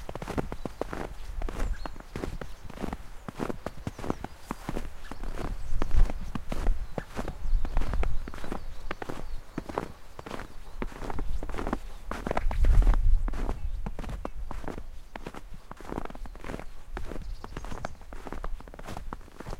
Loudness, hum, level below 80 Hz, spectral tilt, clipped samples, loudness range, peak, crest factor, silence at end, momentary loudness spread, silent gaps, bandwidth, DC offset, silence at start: -36 LUFS; none; -30 dBFS; -6.5 dB/octave; under 0.1%; 10 LU; -10 dBFS; 18 dB; 0 s; 12 LU; none; 11 kHz; under 0.1%; 0 s